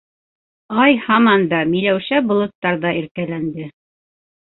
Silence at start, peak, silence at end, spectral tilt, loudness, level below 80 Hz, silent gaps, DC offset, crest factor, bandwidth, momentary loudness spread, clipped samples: 0.7 s; -2 dBFS; 0.9 s; -11 dB/octave; -17 LUFS; -58 dBFS; 2.55-2.62 s, 3.11-3.15 s; under 0.1%; 16 dB; 4.2 kHz; 12 LU; under 0.1%